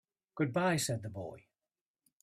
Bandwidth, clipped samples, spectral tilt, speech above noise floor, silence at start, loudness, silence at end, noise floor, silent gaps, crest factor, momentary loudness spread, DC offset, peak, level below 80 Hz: 15.5 kHz; under 0.1%; -4.5 dB/octave; over 56 dB; 0.35 s; -34 LUFS; 0.85 s; under -90 dBFS; none; 18 dB; 16 LU; under 0.1%; -20 dBFS; -72 dBFS